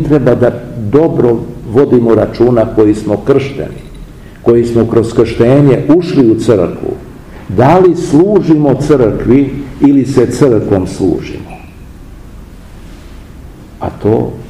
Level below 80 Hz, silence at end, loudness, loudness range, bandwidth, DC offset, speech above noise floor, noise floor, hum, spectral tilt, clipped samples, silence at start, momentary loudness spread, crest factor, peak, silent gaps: -32 dBFS; 0 s; -10 LUFS; 7 LU; 12 kHz; 0.5%; 22 dB; -31 dBFS; none; -8 dB/octave; 3%; 0 s; 13 LU; 10 dB; 0 dBFS; none